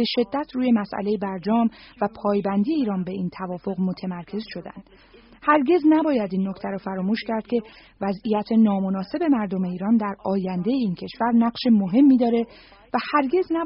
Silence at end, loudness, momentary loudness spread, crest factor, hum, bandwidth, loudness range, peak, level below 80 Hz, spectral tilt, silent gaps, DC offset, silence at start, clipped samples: 0 s; -23 LUFS; 11 LU; 18 dB; none; 5.6 kHz; 5 LU; -4 dBFS; -58 dBFS; -5.5 dB/octave; none; under 0.1%; 0 s; under 0.1%